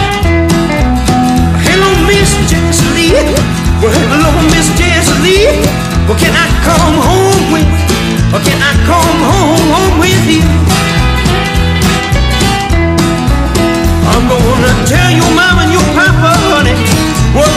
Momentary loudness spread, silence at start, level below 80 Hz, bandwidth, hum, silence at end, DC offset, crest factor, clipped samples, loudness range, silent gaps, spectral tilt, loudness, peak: 3 LU; 0 s; -16 dBFS; 16 kHz; none; 0 s; under 0.1%; 8 dB; under 0.1%; 2 LU; none; -4.5 dB/octave; -8 LUFS; 0 dBFS